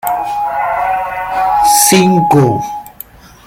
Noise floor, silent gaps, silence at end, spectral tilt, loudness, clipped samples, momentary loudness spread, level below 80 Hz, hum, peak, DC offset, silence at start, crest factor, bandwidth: -35 dBFS; none; 0.55 s; -4 dB/octave; -11 LUFS; under 0.1%; 19 LU; -42 dBFS; none; 0 dBFS; under 0.1%; 0.05 s; 12 dB; 17.5 kHz